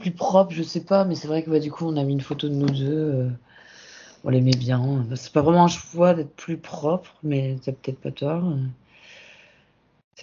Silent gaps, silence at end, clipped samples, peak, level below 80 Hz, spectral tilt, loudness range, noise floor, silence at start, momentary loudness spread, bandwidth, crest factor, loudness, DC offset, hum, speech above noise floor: 10.04-10.11 s; 0 s; under 0.1%; -4 dBFS; -58 dBFS; -7 dB/octave; 7 LU; -61 dBFS; 0 s; 12 LU; 7.4 kHz; 20 dB; -23 LUFS; under 0.1%; none; 39 dB